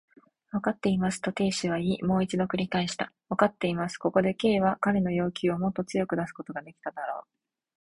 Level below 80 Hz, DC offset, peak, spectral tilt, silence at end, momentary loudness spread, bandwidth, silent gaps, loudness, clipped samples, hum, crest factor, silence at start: -58 dBFS; under 0.1%; -6 dBFS; -6 dB/octave; 0.6 s; 11 LU; 11.5 kHz; none; -28 LUFS; under 0.1%; none; 22 dB; 0.55 s